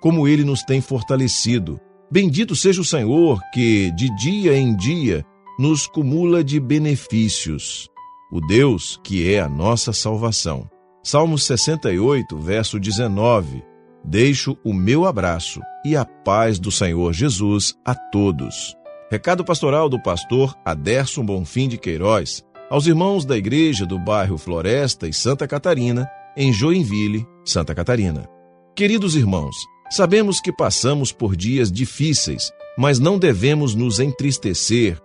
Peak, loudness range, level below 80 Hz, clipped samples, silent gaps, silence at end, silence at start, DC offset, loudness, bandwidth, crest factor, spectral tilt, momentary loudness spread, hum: -2 dBFS; 2 LU; -42 dBFS; under 0.1%; none; 0.05 s; 0 s; under 0.1%; -19 LUFS; 11 kHz; 16 dB; -5 dB/octave; 9 LU; none